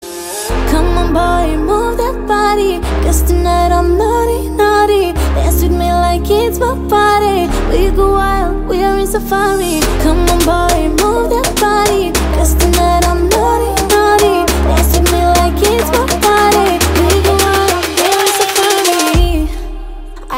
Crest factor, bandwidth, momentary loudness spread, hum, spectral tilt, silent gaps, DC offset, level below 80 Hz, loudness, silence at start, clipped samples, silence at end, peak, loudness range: 12 dB; 16.5 kHz; 5 LU; none; -4.5 dB/octave; none; under 0.1%; -18 dBFS; -12 LUFS; 0 s; under 0.1%; 0 s; 0 dBFS; 2 LU